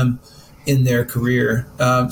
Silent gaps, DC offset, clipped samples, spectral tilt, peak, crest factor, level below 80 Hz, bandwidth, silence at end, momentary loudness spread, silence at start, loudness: none; under 0.1%; under 0.1%; -6.5 dB/octave; -6 dBFS; 12 dB; -44 dBFS; 17.5 kHz; 0 s; 8 LU; 0 s; -19 LUFS